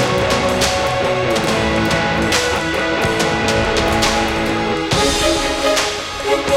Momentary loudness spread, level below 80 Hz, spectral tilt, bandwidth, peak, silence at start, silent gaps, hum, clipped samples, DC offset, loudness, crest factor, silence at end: 3 LU; -32 dBFS; -3.5 dB/octave; 17 kHz; -2 dBFS; 0 s; none; none; under 0.1%; under 0.1%; -16 LUFS; 14 dB; 0 s